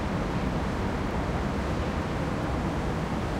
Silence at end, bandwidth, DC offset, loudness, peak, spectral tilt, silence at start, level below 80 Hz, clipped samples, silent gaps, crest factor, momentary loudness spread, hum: 0 s; 15.5 kHz; under 0.1%; -30 LUFS; -16 dBFS; -7 dB/octave; 0 s; -36 dBFS; under 0.1%; none; 12 dB; 1 LU; none